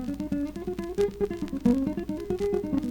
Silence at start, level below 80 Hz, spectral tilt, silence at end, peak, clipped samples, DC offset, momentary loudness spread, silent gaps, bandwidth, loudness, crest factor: 0 s; -46 dBFS; -7.5 dB/octave; 0 s; -12 dBFS; under 0.1%; under 0.1%; 8 LU; none; 18.5 kHz; -29 LUFS; 16 dB